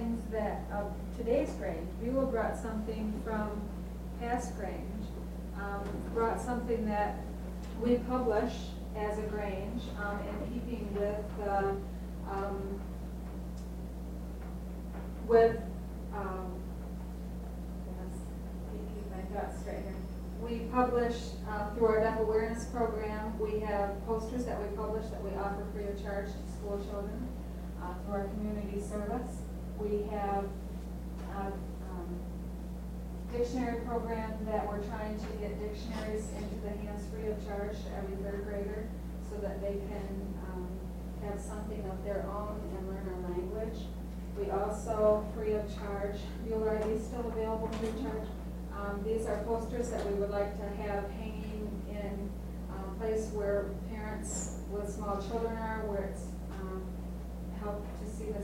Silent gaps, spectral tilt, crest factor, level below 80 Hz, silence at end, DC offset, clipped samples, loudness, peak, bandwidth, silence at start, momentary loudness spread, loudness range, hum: none; -7 dB/octave; 22 dB; -42 dBFS; 0 s; under 0.1%; under 0.1%; -36 LUFS; -14 dBFS; 16 kHz; 0 s; 10 LU; 6 LU; none